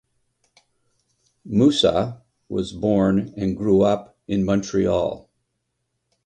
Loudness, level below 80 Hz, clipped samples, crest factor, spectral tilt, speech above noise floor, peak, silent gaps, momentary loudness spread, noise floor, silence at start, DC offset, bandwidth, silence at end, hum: -21 LUFS; -48 dBFS; under 0.1%; 18 dB; -6.5 dB/octave; 56 dB; -4 dBFS; none; 10 LU; -75 dBFS; 1.45 s; under 0.1%; 9.6 kHz; 1.1 s; none